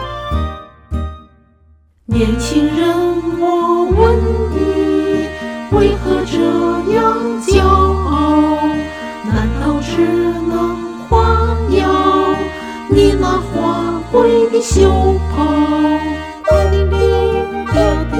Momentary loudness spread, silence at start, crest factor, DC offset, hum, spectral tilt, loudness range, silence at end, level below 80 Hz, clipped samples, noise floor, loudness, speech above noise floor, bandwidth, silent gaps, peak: 9 LU; 0 s; 14 dB; under 0.1%; none; -6.5 dB/octave; 3 LU; 0 s; -22 dBFS; under 0.1%; -49 dBFS; -14 LUFS; 37 dB; 13.5 kHz; none; 0 dBFS